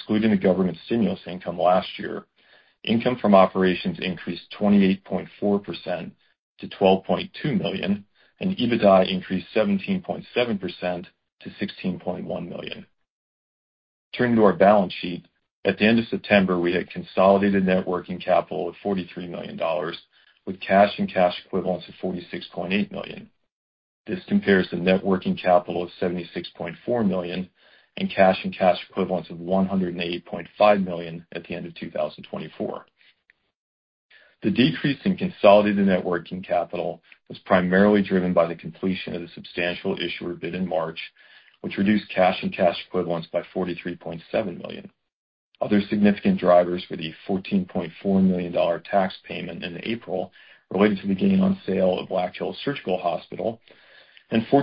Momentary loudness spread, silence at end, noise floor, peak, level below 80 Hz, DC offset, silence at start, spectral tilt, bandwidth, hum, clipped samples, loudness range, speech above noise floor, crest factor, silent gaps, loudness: 15 LU; 0 s; -65 dBFS; -2 dBFS; -56 dBFS; under 0.1%; 0 s; -11 dB/octave; 5.4 kHz; none; under 0.1%; 6 LU; 42 dB; 22 dB; 6.39-6.56 s, 11.32-11.37 s, 13.10-14.11 s, 15.51-15.63 s, 23.51-24.04 s, 33.55-34.09 s, 45.12-45.52 s; -23 LUFS